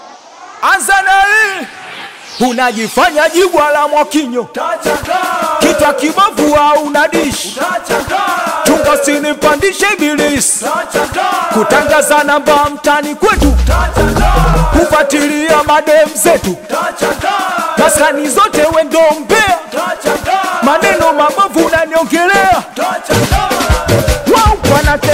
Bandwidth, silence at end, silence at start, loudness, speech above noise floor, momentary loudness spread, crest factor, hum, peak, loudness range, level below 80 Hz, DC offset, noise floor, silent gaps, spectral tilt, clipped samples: 16.5 kHz; 0 s; 0 s; -10 LUFS; 23 dB; 6 LU; 10 dB; none; 0 dBFS; 1 LU; -22 dBFS; under 0.1%; -33 dBFS; none; -4 dB/octave; under 0.1%